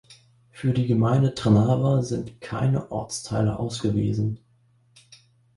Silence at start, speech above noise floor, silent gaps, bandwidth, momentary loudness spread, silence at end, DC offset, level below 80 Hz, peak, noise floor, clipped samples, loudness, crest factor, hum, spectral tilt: 0.1 s; 39 dB; none; 11.5 kHz; 10 LU; 1.2 s; under 0.1%; -50 dBFS; -6 dBFS; -61 dBFS; under 0.1%; -24 LUFS; 18 dB; none; -7 dB/octave